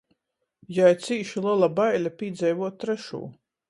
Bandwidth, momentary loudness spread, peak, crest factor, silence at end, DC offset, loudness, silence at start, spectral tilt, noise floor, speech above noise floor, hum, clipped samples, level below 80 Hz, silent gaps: 11.5 kHz; 12 LU; -8 dBFS; 18 dB; 0.35 s; under 0.1%; -24 LUFS; 0.7 s; -6 dB/octave; -76 dBFS; 52 dB; none; under 0.1%; -72 dBFS; none